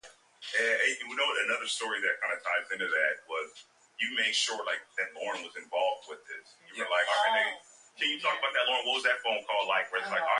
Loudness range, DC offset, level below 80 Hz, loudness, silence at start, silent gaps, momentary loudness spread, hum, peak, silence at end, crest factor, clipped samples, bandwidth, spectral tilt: 4 LU; under 0.1%; -88 dBFS; -30 LUFS; 0.05 s; none; 13 LU; none; -12 dBFS; 0 s; 18 dB; under 0.1%; 11.5 kHz; 0.5 dB/octave